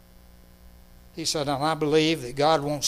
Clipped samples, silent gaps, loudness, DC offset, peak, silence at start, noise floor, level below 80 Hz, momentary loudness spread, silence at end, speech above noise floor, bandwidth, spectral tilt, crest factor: under 0.1%; none; -24 LUFS; under 0.1%; -8 dBFS; 0.65 s; -51 dBFS; -52 dBFS; 7 LU; 0 s; 27 dB; 15.5 kHz; -4 dB/octave; 20 dB